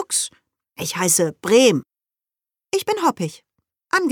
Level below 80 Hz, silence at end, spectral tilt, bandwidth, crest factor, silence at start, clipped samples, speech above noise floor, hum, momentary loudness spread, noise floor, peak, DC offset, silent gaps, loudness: -68 dBFS; 0 s; -3 dB/octave; 19 kHz; 18 dB; 0 s; under 0.1%; over 71 dB; none; 14 LU; under -90 dBFS; -2 dBFS; under 0.1%; none; -19 LUFS